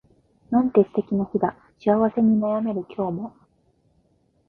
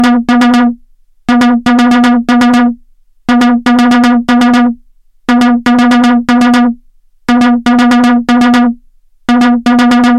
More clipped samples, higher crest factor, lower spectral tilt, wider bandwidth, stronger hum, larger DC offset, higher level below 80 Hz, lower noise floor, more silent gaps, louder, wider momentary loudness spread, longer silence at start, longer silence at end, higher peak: neither; first, 20 dB vs 8 dB; first, -11 dB/octave vs -4.5 dB/octave; second, 4.2 kHz vs 10.5 kHz; neither; neither; second, -58 dBFS vs -40 dBFS; first, -64 dBFS vs -43 dBFS; neither; second, -23 LUFS vs -8 LUFS; second, 9 LU vs 13 LU; first, 0.5 s vs 0 s; first, 1.2 s vs 0 s; second, -4 dBFS vs 0 dBFS